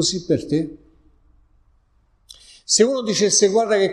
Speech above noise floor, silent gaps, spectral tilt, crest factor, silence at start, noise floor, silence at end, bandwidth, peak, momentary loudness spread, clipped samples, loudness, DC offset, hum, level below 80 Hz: 42 dB; none; -3 dB/octave; 18 dB; 0 s; -60 dBFS; 0 s; 12 kHz; -4 dBFS; 10 LU; under 0.1%; -18 LUFS; under 0.1%; none; -54 dBFS